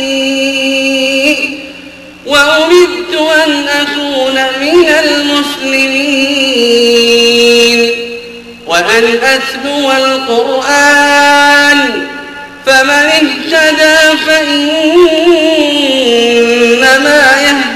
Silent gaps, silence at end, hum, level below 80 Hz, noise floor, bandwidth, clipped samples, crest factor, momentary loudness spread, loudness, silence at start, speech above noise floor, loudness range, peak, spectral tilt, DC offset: none; 0 s; none; -46 dBFS; -30 dBFS; 16 kHz; 0.3%; 8 dB; 8 LU; -7 LUFS; 0 s; 22 dB; 3 LU; 0 dBFS; -1.5 dB/octave; under 0.1%